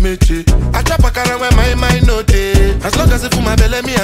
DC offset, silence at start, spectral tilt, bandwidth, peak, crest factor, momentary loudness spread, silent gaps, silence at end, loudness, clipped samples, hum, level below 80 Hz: under 0.1%; 0 s; -5 dB/octave; 16 kHz; 0 dBFS; 10 dB; 2 LU; none; 0 s; -13 LUFS; under 0.1%; none; -14 dBFS